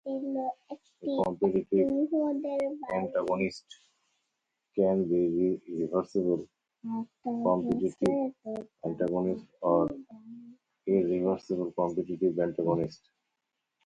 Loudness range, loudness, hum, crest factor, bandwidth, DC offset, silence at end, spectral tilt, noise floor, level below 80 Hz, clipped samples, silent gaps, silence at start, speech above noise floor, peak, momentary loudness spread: 2 LU; -30 LUFS; none; 18 dB; 9.4 kHz; under 0.1%; 0.9 s; -8.5 dB/octave; -84 dBFS; -64 dBFS; under 0.1%; none; 0.05 s; 55 dB; -12 dBFS; 12 LU